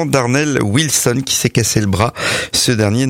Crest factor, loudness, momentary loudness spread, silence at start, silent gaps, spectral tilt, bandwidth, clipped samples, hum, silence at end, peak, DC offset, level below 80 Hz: 14 dB; -14 LUFS; 3 LU; 0 s; none; -4 dB/octave; 16.5 kHz; under 0.1%; none; 0 s; -2 dBFS; under 0.1%; -42 dBFS